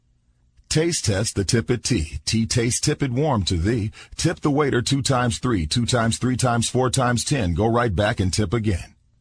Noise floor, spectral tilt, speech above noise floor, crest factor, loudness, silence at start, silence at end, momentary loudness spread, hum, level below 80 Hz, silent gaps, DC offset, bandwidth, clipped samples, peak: -61 dBFS; -4.5 dB/octave; 40 dB; 16 dB; -21 LUFS; 0.7 s; 0.35 s; 4 LU; none; -38 dBFS; none; under 0.1%; 10.5 kHz; under 0.1%; -6 dBFS